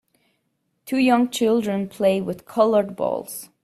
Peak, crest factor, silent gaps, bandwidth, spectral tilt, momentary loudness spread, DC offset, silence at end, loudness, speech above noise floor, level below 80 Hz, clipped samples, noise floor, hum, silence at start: -4 dBFS; 18 dB; none; 15 kHz; -5.5 dB/octave; 9 LU; under 0.1%; 0.2 s; -21 LUFS; 51 dB; -64 dBFS; under 0.1%; -72 dBFS; none; 0.85 s